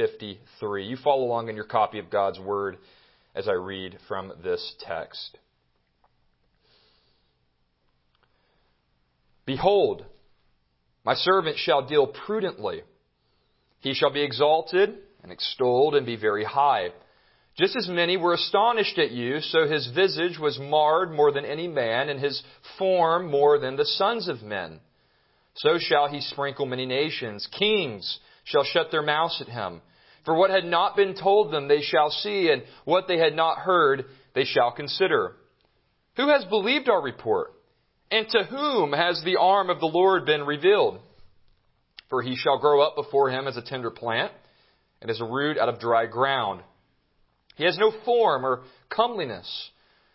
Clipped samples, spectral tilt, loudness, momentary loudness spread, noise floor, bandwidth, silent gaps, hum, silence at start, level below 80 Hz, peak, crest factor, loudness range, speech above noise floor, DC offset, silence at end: under 0.1%; -8.5 dB/octave; -24 LUFS; 12 LU; -70 dBFS; 5.8 kHz; none; none; 0 s; -66 dBFS; -6 dBFS; 20 dB; 7 LU; 46 dB; under 0.1%; 0.45 s